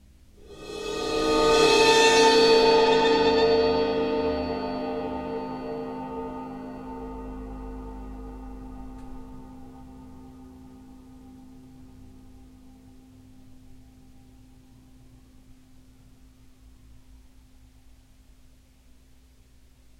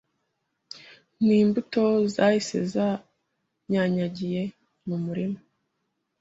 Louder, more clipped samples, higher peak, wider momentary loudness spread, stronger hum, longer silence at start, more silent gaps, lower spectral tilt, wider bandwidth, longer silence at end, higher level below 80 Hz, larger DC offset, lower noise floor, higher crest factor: first, -22 LUFS vs -25 LUFS; neither; about the same, -6 dBFS vs -8 dBFS; first, 28 LU vs 18 LU; neither; second, 0.4 s vs 0.75 s; neither; second, -3 dB/octave vs -6.5 dB/octave; first, 13.5 kHz vs 7.8 kHz; first, 6.2 s vs 0.85 s; first, -46 dBFS vs -66 dBFS; neither; second, -55 dBFS vs -78 dBFS; about the same, 20 dB vs 20 dB